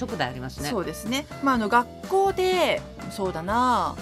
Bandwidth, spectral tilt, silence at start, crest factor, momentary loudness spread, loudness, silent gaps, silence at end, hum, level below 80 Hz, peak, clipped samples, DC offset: 15 kHz; -4.5 dB/octave; 0 s; 20 dB; 8 LU; -25 LUFS; none; 0 s; none; -48 dBFS; -6 dBFS; under 0.1%; under 0.1%